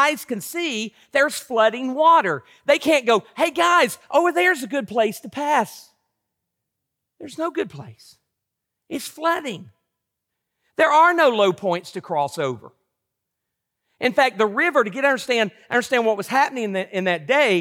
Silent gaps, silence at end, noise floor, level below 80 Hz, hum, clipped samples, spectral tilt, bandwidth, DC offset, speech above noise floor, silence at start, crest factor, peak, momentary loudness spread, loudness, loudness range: none; 0 s; -81 dBFS; -72 dBFS; none; under 0.1%; -3.5 dB/octave; 17 kHz; under 0.1%; 61 dB; 0 s; 16 dB; -4 dBFS; 12 LU; -20 LUFS; 11 LU